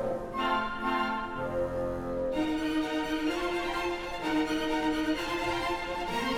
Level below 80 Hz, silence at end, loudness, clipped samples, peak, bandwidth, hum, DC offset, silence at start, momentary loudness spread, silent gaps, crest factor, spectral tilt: -48 dBFS; 0 s; -31 LUFS; under 0.1%; -16 dBFS; 16.5 kHz; none; under 0.1%; 0 s; 4 LU; none; 14 dB; -4.5 dB/octave